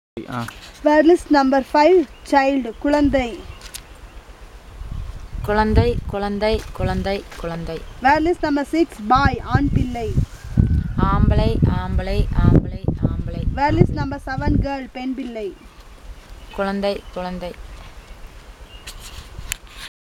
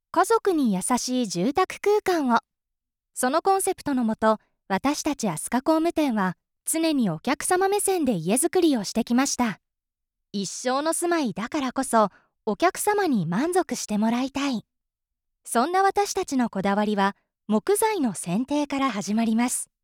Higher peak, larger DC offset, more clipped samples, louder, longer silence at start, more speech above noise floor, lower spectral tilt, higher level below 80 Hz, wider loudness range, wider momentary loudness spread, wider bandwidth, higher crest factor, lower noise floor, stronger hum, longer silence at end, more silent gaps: first, 0 dBFS vs -8 dBFS; neither; neither; first, -20 LUFS vs -24 LUFS; about the same, 0.15 s vs 0.15 s; second, 22 dB vs 61 dB; first, -7 dB/octave vs -4 dB/octave; first, -28 dBFS vs -60 dBFS; first, 12 LU vs 2 LU; first, 19 LU vs 6 LU; about the same, 17 kHz vs 18 kHz; about the same, 20 dB vs 16 dB; second, -40 dBFS vs -84 dBFS; neither; about the same, 0.15 s vs 0.2 s; neither